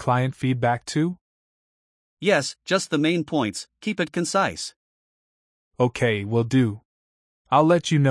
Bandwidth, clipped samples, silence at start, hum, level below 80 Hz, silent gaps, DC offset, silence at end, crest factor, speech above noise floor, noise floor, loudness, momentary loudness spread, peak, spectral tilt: 12 kHz; under 0.1%; 0 s; none; -60 dBFS; 1.21-2.17 s, 4.76-5.71 s, 6.85-7.45 s; under 0.1%; 0 s; 18 dB; over 68 dB; under -90 dBFS; -23 LUFS; 10 LU; -6 dBFS; -5.5 dB/octave